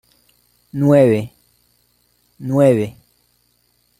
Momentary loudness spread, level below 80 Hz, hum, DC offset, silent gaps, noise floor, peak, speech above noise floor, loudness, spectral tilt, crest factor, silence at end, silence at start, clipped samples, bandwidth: 19 LU; -58 dBFS; 60 Hz at -50 dBFS; under 0.1%; none; -62 dBFS; -2 dBFS; 48 dB; -15 LUFS; -8.5 dB/octave; 18 dB; 1.1 s; 0.75 s; under 0.1%; 15.5 kHz